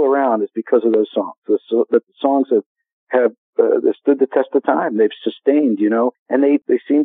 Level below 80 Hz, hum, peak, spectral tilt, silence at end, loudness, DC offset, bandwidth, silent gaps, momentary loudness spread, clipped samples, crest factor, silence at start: under -90 dBFS; none; 0 dBFS; -4.5 dB/octave; 0 s; -17 LUFS; under 0.1%; 4 kHz; 1.38-1.42 s, 2.66-2.75 s, 2.93-3.07 s, 3.38-3.53 s, 6.19-6.26 s; 5 LU; under 0.1%; 16 dB; 0 s